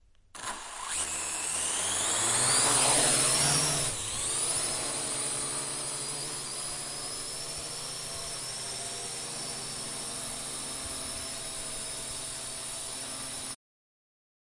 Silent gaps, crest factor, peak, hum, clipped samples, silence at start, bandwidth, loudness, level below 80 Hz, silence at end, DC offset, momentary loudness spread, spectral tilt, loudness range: none; 20 dB; -12 dBFS; none; under 0.1%; 0.35 s; 12 kHz; -29 LUFS; -56 dBFS; 1 s; under 0.1%; 13 LU; -1 dB/octave; 10 LU